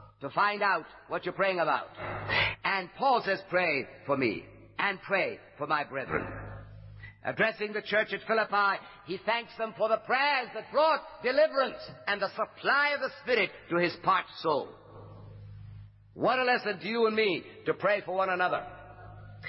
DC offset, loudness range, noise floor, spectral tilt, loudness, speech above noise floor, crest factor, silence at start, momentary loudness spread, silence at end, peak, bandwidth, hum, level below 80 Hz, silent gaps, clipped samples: under 0.1%; 3 LU; -49 dBFS; -8 dB/octave; -29 LUFS; 20 dB; 18 dB; 0 s; 19 LU; 0 s; -12 dBFS; 5.8 kHz; none; -60 dBFS; none; under 0.1%